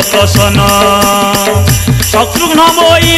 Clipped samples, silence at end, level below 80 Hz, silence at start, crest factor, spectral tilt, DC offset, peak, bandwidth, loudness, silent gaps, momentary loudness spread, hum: 0.2%; 0 s; -24 dBFS; 0 s; 8 dB; -4 dB/octave; under 0.1%; 0 dBFS; 16.5 kHz; -7 LUFS; none; 3 LU; none